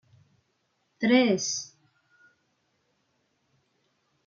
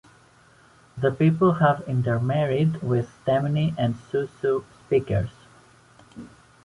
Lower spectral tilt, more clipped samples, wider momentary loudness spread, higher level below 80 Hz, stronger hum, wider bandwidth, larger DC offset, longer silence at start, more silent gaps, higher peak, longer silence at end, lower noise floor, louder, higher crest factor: second, -3.5 dB/octave vs -8.5 dB/octave; neither; first, 13 LU vs 10 LU; second, -80 dBFS vs -52 dBFS; neither; second, 7.6 kHz vs 11 kHz; neither; about the same, 1 s vs 0.95 s; neither; second, -10 dBFS vs -6 dBFS; first, 2.6 s vs 0.4 s; first, -74 dBFS vs -55 dBFS; about the same, -25 LUFS vs -24 LUFS; about the same, 22 dB vs 20 dB